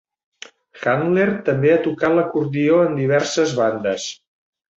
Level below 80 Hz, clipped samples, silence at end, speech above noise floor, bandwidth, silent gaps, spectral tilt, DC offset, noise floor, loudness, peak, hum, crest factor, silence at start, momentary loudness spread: -60 dBFS; under 0.1%; 0.65 s; 25 dB; 8 kHz; none; -5.5 dB/octave; under 0.1%; -43 dBFS; -18 LUFS; -4 dBFS; none; 14 dB; 0.75 s; 7 LU